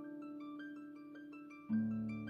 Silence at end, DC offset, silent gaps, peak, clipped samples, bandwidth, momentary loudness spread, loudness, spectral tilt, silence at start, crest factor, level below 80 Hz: 0 s; under 0.1%; none; -28 dBFS; under 0.1%; 5 kHz; 15 LU; -44 LUFS; -9 dB/octave; 0 s; 16 dB; -78 dBFS